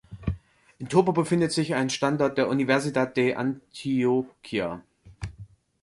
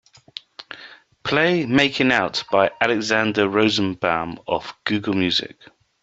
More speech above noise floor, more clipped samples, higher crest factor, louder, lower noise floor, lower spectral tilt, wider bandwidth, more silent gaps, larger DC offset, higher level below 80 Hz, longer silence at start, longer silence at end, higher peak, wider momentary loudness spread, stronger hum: about the same, 24 dB vs 25 dB; neither; about the same, 20 dB vs 20 dB; second, -25 LUFS vs -20 LUFS; about the same, -48 dBFS vs -45 dBFS; about the same, -5.5 dB/octave vs -4.5 dB/octave; first, 11.5 kHz vs 8 kHz; neither; neither; first, -48 dBFS vs -56 dBFS; second, 0.1 s vs 0.6 s; second, 0.35 s vs 0.5 s; second, -6 dBFS vs -2 dBFS; second, 17 LU vs 20 LU; neither